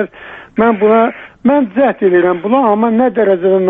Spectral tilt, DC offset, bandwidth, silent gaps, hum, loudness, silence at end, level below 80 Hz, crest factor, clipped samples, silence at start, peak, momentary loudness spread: -10 dB/octave; under 0.1%; 3.9 kHz; none; none; -12 LUFS; 0 s; -52 dBFS; 10 dB; under 0.1%; 0 s; -2 dBFS; 7 LU